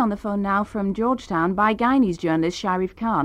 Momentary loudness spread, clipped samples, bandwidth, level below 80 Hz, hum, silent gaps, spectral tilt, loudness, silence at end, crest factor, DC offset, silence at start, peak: 5 LU; under 0.1%; 10.5 kHz; -48 dBFS; none; none; -6.5 dB/octave; -22 LUFS; 0 s; 14 dB; under 0.1%; 0 s; -8 dBFS